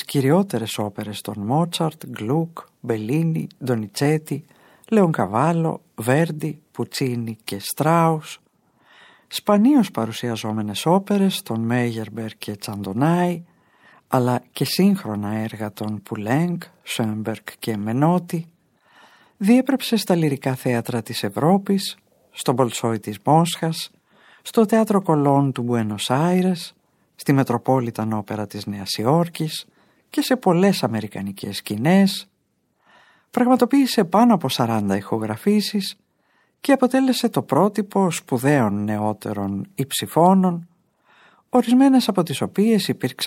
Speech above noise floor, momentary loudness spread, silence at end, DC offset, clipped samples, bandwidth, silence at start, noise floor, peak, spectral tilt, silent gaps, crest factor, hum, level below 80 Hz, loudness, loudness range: 49 dB; 12 LU; 0 s; under 0.1%; under 0.1%; 17 kHz; 0 s; -69 dBFS; -4 dBFS; -6 dB/octave; none; 18 dB; none; -70 dBFS; -21 LUFS; 4 LU